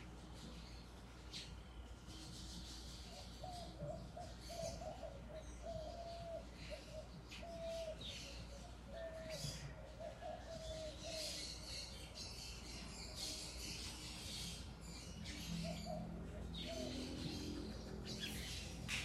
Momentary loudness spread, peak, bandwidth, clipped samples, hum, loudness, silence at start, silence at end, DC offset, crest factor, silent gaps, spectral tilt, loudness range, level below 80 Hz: 8 LU; -28 dBFS; 15.5 kHz; under 0.1%; none; -50 LUFS; 0 s; 0 s; under 0.1%; 22 dB; none; -4 dB/octave; 5 LU; -56 dBFS